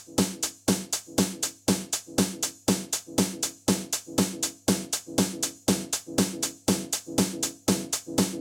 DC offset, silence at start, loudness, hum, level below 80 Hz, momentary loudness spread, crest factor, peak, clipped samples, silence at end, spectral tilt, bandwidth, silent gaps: under 0.1%; 0 s; -27 LUFS; none; -54 dBFS; 2 LU; 20 dB; -8 dBFS; under 0.1%; 0 s; -3.5 dB/octave; 19 kHz; none